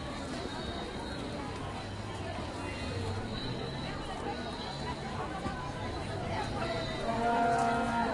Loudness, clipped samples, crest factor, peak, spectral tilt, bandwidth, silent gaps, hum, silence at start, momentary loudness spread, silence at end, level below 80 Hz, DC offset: -36 LUFS; under 0.1%; 18 dB; -18 dBFS; -5.5 dB/octave; 11.5 kHz; none; none; 0 s; 9 LU; 0 s; -48 dBFS; under 0.1%